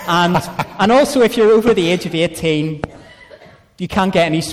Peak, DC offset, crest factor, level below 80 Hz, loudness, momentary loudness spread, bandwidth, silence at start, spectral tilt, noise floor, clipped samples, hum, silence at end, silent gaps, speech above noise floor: -4 dBFS; under 0.1%; 10 dB; -44 dBFS; -15 LUFS; 12 LU; 15.5 kHz; 0 s; -5.5 dB/octave; -42 dBFS; under 0.1%; none; 0 s; none; 28 dB